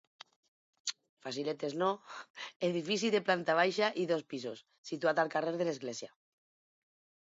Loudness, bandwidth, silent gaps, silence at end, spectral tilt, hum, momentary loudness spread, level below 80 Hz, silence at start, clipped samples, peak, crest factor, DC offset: -34 LUFS; 7.6 kHz; 1.09-1.17 s, 2.30-2.34 s, 2.56-2.60 s, 4.78-4.84 s; 1.25 s; -3 dB/octave; none; 15 LU; -86 dBFS; 0.85 s; under 0.1%; -14 dBFS; 22 dB; under 0.1%